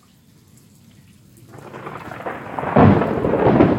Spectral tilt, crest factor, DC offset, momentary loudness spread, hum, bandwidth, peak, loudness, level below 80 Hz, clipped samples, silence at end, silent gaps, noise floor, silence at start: -9 dB/octave; 20 dB; under 0.1%; 21 LU; none; 13.5 kHz; 0 dBFS; -17 LUFS; -42 dBFS; under 0.1%; 0 s; none; -51 dBFS; 1.55 s